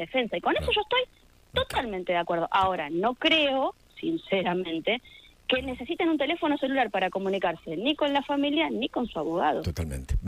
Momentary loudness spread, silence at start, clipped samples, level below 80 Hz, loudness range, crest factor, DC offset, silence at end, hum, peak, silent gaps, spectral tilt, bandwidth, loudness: 7 LU; 0 s; under 0.1%; -44 dBFS; 2 LU; 18 dB; under 0.1%; 0 s; none; -10 dBFS; none; -5.5 dB/octave; 15.5 kHz; -27 LUFS